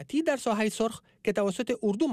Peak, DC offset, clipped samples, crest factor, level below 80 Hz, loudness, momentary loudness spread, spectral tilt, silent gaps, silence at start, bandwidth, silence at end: -16 dBFS; under 0.1%; under 0.1%; 12 dB; -64 dBFS; -29 LUFS; 4 LU; -5 dB/octave; none; 0 s; 15 kHz; 0 s